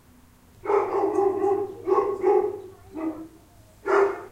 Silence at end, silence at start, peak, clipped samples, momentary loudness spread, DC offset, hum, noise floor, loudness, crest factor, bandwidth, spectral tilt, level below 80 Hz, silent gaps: 0.05 s; 0.65 s; -10 dBFS; under 0.1%; 16 LU; under 0.1%; none; -54 dBFS; -24 LUFS; 16 dB; 9.6 kHz; -6.5 dB/octave; -60 dBFS; none